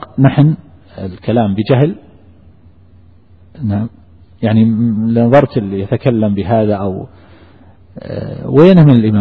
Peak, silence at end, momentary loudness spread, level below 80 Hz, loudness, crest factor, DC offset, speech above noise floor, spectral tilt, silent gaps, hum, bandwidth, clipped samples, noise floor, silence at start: 0 dBFS; 0 s; 18 LU; -44 dBFS; -12 LUFS; 12 dB; 0.4%; 33 dB; -10.5 dB/octave; none; none; 4.9 kHz; under 0.1%; -44 dBFS; 0 s